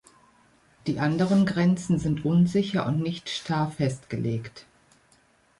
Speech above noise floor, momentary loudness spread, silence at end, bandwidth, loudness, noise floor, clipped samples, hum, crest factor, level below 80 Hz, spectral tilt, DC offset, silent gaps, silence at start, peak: 37 dB; 10 LU; 1 s; 11.5 kHz; -26 LUFS; -62 dBFS; under 0.1%; none; 14 dB; -54 dBFS; -7 dB/octave; under 0.1%; none; 0.85 s; -12 dBFS